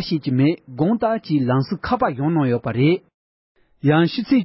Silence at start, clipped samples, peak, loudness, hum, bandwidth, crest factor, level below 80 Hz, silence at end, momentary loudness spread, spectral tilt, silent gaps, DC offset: 0 s; under 0.1%; -4 dBFS; -20 LUFS; none; 5.8 kHz; 14 dB; -50 dBFS; 0 s; 4 LU; -12 dB/octave; 3.14-3.55 s; under 0.1%